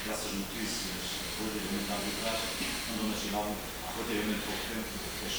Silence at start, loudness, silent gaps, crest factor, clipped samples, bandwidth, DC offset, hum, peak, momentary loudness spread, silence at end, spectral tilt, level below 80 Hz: 0 s; -34 LUFS; none; 14 dB; under 0.1%; over 20 kHz; under 0.1%; none; -20 dBFS; 4 LU; 0 s; -3 dB/octave; -50 dBFS